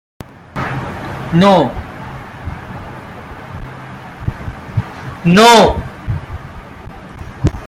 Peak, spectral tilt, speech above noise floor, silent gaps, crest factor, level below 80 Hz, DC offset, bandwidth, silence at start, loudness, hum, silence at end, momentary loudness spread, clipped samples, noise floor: 0 dBFS; -5.5 dB/octave; 24 dB; none; 16 dB; -34 dBFS; under 0.1%; 16 kHz; 0.55 s; -14 LUFS; none; 0 s; 23 LU; under 0.1%; -33 dBFS